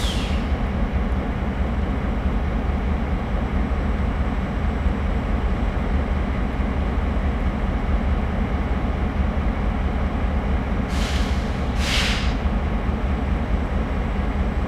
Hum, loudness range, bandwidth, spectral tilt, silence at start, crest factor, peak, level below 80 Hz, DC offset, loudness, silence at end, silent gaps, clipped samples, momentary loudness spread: none; 1 LU; 12 kHz; -6.5 dB/octave; 0 s; 14 dB; -8 dBFS; -24 dBFS; under 0.1%; -24 LUFS; 0 s; none; under 0.1%; 2 LU